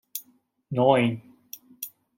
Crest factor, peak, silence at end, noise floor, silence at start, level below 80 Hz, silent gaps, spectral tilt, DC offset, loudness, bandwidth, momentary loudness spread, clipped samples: 22 dB; -6 dBFS; 0.3 s; -60 dBFS; 0.15 s; -72 dBFS; none; -6 dB/octave; under 0.1%; -23 LUFS; 17 kHz; 23 LU; under 0.1%